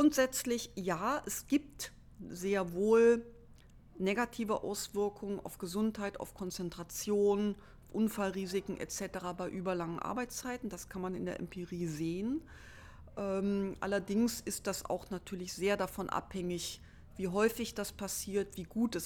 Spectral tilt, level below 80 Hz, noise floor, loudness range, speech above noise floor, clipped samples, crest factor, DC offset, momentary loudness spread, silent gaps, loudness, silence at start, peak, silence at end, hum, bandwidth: -4.5 dB/octave; -60 dBFS; -57 dBFS; 6 LU; 22 dB; under 0.1%; 20 dB; under 0.1%; 11 LU; none; -36 LUFS; 0 s; -16 dBFS; 0 s; none; 19 kHz